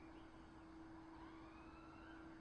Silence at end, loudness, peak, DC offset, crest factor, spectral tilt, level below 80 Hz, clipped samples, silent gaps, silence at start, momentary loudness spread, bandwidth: 0 s; -60 LUFS; -46 dBFS; under 0.1%; 14 dB; -6.5 dB/octave; -70 dBFS; under 0.1%; none; 0 s; 2 LU; 9 kHz